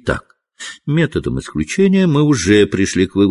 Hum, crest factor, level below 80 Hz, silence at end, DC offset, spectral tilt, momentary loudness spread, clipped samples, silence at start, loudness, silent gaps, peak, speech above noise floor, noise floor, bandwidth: none; 14 dB; -36 dBFS; 0 s; under 0.1%; -6 dB/octave; 13 LU; under 0.1%; 0.05 s; -15 LUFS; none; 0 dBFS; 22 dB; -36 dBFS; 11.5 kHz